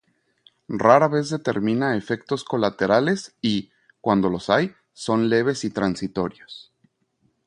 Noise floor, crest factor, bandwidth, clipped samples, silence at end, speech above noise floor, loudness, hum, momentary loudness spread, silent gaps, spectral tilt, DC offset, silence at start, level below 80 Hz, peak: -68 dBFS; 22 dB; 11 kHz; under 0.1%; 0.85 s; 47 dB; -22 LUFS; none; 13 LU; none; -6 dB/octave; under 0.1%; 0.7 s; -58 dBFS; 0 dBFS